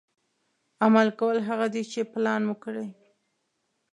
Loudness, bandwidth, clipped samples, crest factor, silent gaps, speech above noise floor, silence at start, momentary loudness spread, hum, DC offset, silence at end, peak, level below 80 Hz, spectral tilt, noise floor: -26 LUFS; 9.8 kHz; under 0.1%; 22 dB; none; 51 dB; 0.8 s; 14 LU; none; under 0.1%; 1 s; -6 dBFS; -82 dBFS; -6 dB/octave; -76 dBFS